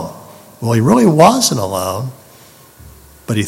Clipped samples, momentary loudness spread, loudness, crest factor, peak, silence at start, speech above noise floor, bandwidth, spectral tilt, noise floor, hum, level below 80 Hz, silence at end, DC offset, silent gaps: 0.2%; 19 LU; -13 LUFS; 16 dB; 0 dBFS; 0 s; 31 dB; 16.5 kHz; -5 dB/octave; -42 dBFS; none; -48 dBFS; 0 s; under 0.1%; none